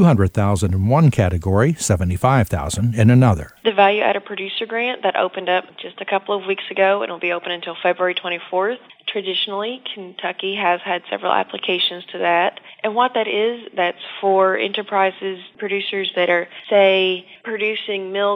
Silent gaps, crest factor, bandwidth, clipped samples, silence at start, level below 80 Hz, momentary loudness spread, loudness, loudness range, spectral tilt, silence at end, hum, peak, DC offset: none; 18 dB; 16.5 kHz; under 0.1%; 0 s; -44 dBFS; 10 LU; -19 LUFS; 5 LU; -5.5 dB/octave; 0 s; none; 0 dBFS; under 0.1%